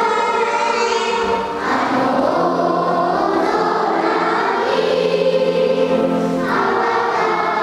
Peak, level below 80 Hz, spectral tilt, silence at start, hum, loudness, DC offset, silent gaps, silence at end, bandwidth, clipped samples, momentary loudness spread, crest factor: -2 dBFS; -52 dBFS; -5 dB/octave; 0 s; none; -17 LUFS; under 0.1%; none; 0 s; 13 kHz; under 0.1%; 2 LU; 14 dB